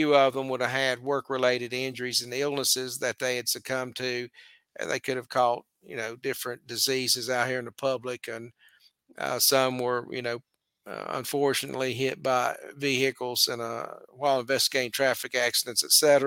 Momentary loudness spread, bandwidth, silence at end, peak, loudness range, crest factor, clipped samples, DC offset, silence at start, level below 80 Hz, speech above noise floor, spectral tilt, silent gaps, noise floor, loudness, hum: 12 LU; 17 kHz; 0 s; -6 dBFS; 4 LU; 22 dB; under 0.1%; under 0.1%; 0 s; -76 dBFS; 33 dB; -2 dB/octave; none; -61 dBFS; -27 LUFS; none